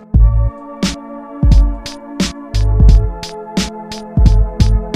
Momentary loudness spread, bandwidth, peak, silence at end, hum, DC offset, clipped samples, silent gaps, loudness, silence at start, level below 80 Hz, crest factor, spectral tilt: 15 LU; 10 kHz; 0 dBFS; 0 s; none; under 0.1%; 0.2%; none; -15 LUFS; 0.15 s; -14 dBFS; 12 dB; -6 dB/octave